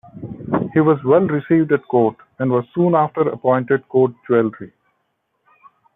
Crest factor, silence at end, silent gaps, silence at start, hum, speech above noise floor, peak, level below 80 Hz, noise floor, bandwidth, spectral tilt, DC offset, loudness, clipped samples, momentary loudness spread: 16 dB; 1.3 s; none; 0.15 s; none; 53 dB; -4 dBFS; -60 dBFS; -70 dBFS; 3.9 kHz; -12 dB/octave; under 0.1%; -17 LUFS; under 0.1%; 8 LU